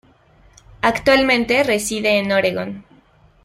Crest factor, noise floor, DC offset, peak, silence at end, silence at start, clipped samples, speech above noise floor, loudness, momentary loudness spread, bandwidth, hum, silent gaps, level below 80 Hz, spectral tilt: 18 dB; -52 dBFS; under 0.1%; -2 dBFS; 0.65 s; 0.85 s; under 0.1%; 35 dB; -17 LUFS; 12 LU; 16 kHz; none; none; -48 dBFS; -3.5 dB/octave